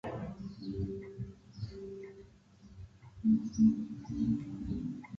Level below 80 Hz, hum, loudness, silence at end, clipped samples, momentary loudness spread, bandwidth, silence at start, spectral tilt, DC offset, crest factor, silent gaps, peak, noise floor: -54 dBFS; none; -35 LUFS; 0 s; under 0.1%; 22 LU; 6.8 kHz; 0.05 s; -8.5 dB/octave; under 0.1%; 18 dB; none; -16 dBFS; -58 dBFS